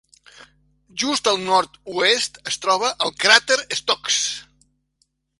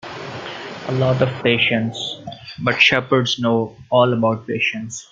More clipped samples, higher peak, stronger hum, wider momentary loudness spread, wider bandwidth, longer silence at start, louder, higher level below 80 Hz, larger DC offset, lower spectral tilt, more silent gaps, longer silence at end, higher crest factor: neither; about the same, 0 dBFS vs 0 dBFS; neither; second, 11 LU vs 16 LU; first, 16 kHz vs 7.8 kHz; first, 0.95 s vs 0.05 s; about the same, -19 LUFS vs -18 LUFS; second, -62 dBFS vs -56 dBFS; neither; second, -0.5 dB/octave vs -5 dB/octave; neither; first, 0.95 s vs 0.1 s; about the same, 22 dB vs 18 dB